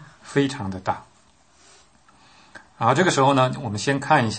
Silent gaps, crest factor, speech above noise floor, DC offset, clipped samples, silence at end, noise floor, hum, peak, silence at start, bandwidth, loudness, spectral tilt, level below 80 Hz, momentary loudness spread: none; 20 dB; 37 dB; under 0.1%; under 0.1%; 0 s; -57 dBFS; none; -4 dBFS; 0 s; 8.8 kHz; -22 LUFS; -5 dB/octave; -62 dBFS; 11 LU